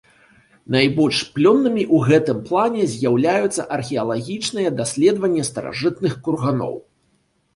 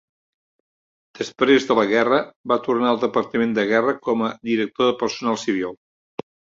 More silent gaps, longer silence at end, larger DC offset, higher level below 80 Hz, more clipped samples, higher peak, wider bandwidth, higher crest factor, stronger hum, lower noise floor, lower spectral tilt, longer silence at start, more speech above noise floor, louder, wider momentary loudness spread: second, none vs 2.36-2.44 s; about the same, 0.75 s vs 0.85 s; neither; first, -58 dBFS vs -64 dBFS; neither; about the same, -2 dBFS vs -2 dBFS; first, 11.5 kHz vs 7.6 kHz; about the same, 18 dB vs 20 dB; neither; second, -64 dBFS vs under -90 dBFS; about the same, -5.5 dB/octave vs -4.5 dB/octave; second, 0.7 s vs 1.2 s; second, 46 dB vs over 70 dB; about the same, -19 LUFS vs -20 LUFS; second, 9 LU vs 14 LU